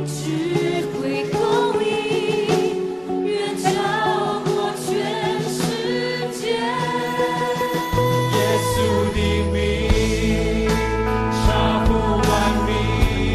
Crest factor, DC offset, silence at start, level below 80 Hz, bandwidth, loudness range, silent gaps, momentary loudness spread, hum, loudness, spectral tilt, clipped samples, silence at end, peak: 16 dB; under 0.1%; 0 s; -30 dBFS; 13.5 kHz; 3 LU; none; 5 LU; none; -20 LUFS; -5.5 dB/octave; under 0.1%; 0 s; -4 dBFS